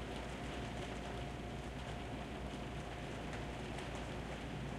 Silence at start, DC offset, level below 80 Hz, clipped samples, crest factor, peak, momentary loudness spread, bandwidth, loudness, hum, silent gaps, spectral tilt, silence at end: 0 s; under 0.1%; -52 dBFS; under 0.1%; 12 dB; -32 dBFS; 1 LU; 14 kHz; -45 LUFS; none; none; -5.5 dB/octave; 0 s